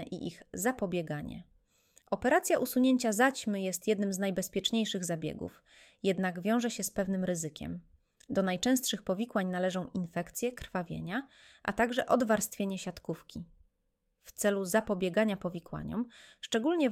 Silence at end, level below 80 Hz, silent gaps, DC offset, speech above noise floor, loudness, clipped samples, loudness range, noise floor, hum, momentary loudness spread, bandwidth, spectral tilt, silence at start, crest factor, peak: 0 s; -62 dBFS; none; under 0.1%; 47 dB; -32 LUFS; under 0.1%; 4 LU; -79 dBFS; none; 14 LU; 16.5 kHz; -4.5 dB/octave; 0 s; 20 dB; -12 dBFS